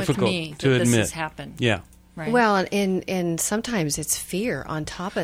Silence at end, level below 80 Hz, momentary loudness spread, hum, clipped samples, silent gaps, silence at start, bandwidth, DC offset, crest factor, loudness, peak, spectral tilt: 0 s; -50 dBFS; 10 LU; none; under 0.1%; none; 0 s; 16.5 kHz; under 0.1%; 18 dB; -23 LUFS; -6 dBFS; -4.5 dB/octave